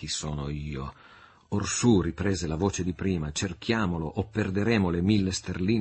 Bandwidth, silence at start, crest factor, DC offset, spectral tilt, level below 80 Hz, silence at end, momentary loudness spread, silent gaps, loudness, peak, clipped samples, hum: 8.8 kHz; 0 s; 18 dB; under 0.1%; -5 dB/octave; -46 dBFS; 0 s; 10 LU; none; -28 LUFS; -10 dBFS; under 0.1%; none